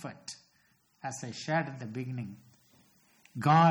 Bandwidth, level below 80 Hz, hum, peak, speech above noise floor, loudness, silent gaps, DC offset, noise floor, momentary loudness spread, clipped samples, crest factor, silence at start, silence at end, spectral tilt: 12.5 kHz; -76 dBFS; none; -14 dBFS; 40 dB; -33 LUFS; none; under 0.1%; -69 dBFS; 19 LU; under 0.1%; 18 dB; 0 s; 0 s; -6 dB/octave